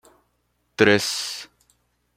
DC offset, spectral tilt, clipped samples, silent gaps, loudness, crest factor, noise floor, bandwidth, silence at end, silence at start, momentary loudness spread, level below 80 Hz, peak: under 0.1%; -3.5 dB/octave; under 0.1%; none; -20 LUFS; 24 dB; -70 dBFS; 16 kHz; 0.7 s; 0.8 s; 18 LU; -64 dBFS; -2 dBFS